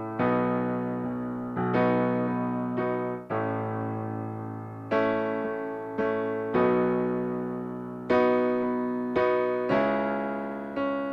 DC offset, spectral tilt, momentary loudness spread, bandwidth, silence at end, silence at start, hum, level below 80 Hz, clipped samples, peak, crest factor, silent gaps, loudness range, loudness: under 0.1%; -9 dB/octave; 9 LU; 6 kHz; 0 s; 0 s; none; -60 dBFS; under 0.1%; -12 dBFS; 16 dB; none; 4 LU; -28 LUFS